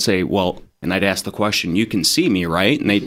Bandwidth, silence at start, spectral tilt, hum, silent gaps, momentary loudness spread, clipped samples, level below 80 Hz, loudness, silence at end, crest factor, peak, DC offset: 16 kHz; 0 s; -4 dB/octave; none; none; 6 LU; under 0.1%; -48 dBFS; -18 LUFS; 0 s; 18 dB; 0 dBFS; under 0.1%